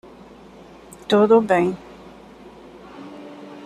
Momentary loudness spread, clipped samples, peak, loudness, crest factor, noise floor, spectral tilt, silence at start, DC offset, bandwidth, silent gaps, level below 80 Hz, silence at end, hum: 27 LU; under 0.1%; -4 dBFS; -17 LUFS; 20 dB; -44 dBFS; -6.5 dB/octave; 1.1 s; under 0.1%; 13 kHz; none; -58 dBFS; 0.05 s; none